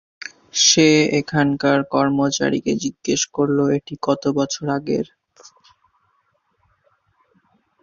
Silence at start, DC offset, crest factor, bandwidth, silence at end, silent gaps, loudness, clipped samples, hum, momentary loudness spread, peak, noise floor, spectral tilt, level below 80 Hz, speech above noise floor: 0.25 s; under 0.1%; 20 dB; 7.4 kHz; 2.8 s; none; -18 LUFS; under 0.1%; none; 11 LU; -2 dBFS; -66 dBFS; -3.5 dB/octave; -58 dBFS; 48 dB